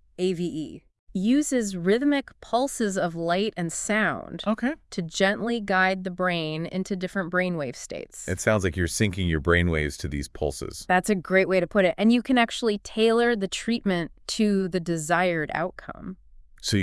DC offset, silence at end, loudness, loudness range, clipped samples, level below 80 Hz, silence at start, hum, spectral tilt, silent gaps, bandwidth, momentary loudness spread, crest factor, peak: under 0.1%; 0 s; -25 LUFS; 4 LU; under 0.1%; -48 dBFS; 0.2 s; none; -5 dB/octave; 0.99-1.07 s; 12 kHz; 11 LU; 20 dB; -4 dBFS